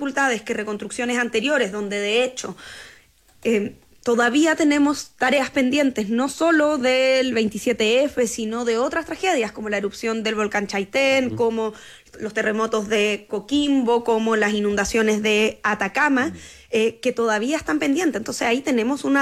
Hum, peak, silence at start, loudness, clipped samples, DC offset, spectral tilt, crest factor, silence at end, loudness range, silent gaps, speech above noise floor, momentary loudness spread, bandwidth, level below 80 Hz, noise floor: none; -8 dBFS; 0 s; -21 LUFS; under 0.1%; under 0.1%; -3.5 dB/octave; 12 dB; 0 s; 4 LU; none; 32 dB; 8 LU; 15 kHz; -54 dBFS; -53 dBFS